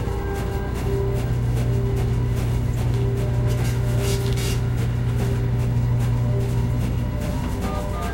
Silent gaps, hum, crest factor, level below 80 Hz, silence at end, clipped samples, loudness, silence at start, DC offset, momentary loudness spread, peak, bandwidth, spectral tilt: none; none; 12 dB; -28 dBFS; 0 s; under 0.1%; -23 LUFS; 0 s; under 0.1%; 4 LU; -10 dBFS; 16 kHz; -7 dB/octave